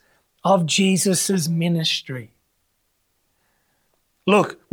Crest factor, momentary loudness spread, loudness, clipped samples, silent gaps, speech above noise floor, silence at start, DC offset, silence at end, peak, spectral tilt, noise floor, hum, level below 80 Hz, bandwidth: 20 dB; 10 LU; -19 LUFS; under 0.1%; none; 50 dB; 0.45 s; under 0.1%; 0.2 s; -4 dBFS; -4 dB/octave; -69 dBFS; none; -70 dBFS; 19 kHz